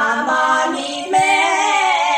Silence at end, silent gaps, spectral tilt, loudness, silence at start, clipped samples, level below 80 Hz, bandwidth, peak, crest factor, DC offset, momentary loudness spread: 0 s; none; -1.5 dB/octave; -15 LUFS; 0 s; under 0.1%; -74 dBFS; 15 kHz; -4 dBFS; 12 dB; under 0.1%; 5 LU